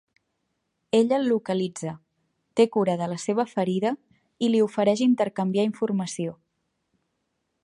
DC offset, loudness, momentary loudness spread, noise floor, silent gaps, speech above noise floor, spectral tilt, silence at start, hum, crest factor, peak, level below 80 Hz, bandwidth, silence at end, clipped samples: under 0.1%; -25 LUFS; 10 LU; -77 dBFS; none; 53 dB; -6 dB/octave; 0.95 s; none; 20 dB; -6 dBFS; -74 dBFS; 11 kHz; 1.3 s; under 0.1%